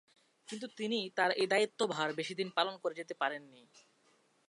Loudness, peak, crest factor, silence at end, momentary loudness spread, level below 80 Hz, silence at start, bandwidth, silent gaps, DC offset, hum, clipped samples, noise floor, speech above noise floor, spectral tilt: -35 LUFS; -16 dBFS; 22 dB; 1 s; 14 LU; -90 dBFS; 0.5 s; 11.5 kHz; none; under 0.1%; none; under 0.1%; -71 dBFS; 36 dB; -3.5 dB/octave